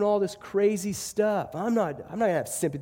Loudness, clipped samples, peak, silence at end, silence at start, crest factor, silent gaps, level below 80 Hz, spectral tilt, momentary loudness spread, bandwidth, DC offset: -27 LUFS; under 0.1%; -12 dBFS; 0 s; 0 s; 14 dB; none; -62 dBFS; -5 dB/octave; 5 LU; 17 kHz; under 0.1%